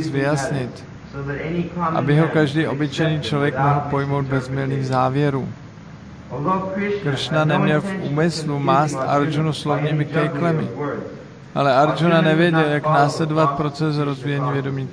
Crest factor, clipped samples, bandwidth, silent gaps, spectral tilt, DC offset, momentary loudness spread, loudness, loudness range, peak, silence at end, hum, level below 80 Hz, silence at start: 16 dB; under 0.1%; 10.5 kHz; none; -7 dB/octave; under 0.1%; 13 LU; -20 LUFS; 4 LU; -4 dBFS; 0 s; none; -50 dBFS; 0 s